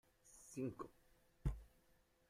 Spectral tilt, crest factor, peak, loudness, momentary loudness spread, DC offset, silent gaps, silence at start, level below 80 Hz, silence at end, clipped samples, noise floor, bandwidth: -7 dB/octave; 22 dB; -30 dBFS; -50 LUFS; 13 LU; under 0.1%; none; 0.25 s; -56 dBFS; 0.6 s; under 0.1%; -76 dBFS; 16 kHz